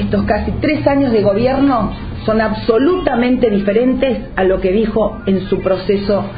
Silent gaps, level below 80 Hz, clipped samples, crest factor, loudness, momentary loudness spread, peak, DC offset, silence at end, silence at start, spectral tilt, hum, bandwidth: none; -32 dBFS; under 0.1%; 14 dB; -15 LUFS; 4 LU; 0 dBFS; under 0.1%; 0 s; 0 s; -11 dB/octave; none; 5 kHz